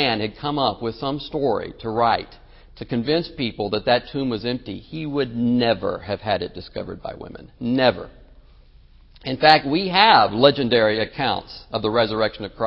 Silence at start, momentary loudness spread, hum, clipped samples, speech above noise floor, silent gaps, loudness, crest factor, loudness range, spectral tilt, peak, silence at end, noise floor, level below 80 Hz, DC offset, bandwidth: 0 s; 17 LU; none; under 0.1%; 28 dB; none; -21 LUFS; 22 dB; 7 LU; -7.5 dB/octave; 0 dBFS; 0 s; -49 dBFS; -48 dBFS; under 0.1%; 8 kHz